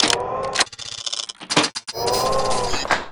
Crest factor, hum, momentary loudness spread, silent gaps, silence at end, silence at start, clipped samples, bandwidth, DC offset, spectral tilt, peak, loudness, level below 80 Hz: 22 dB; none; 6 LU; none; 0 s; 0 s; under 0.1%; 19.5 kHz; under 0.1%; -2 dB/octave; 0 dBFS; -21 LUFS; -42 dBFS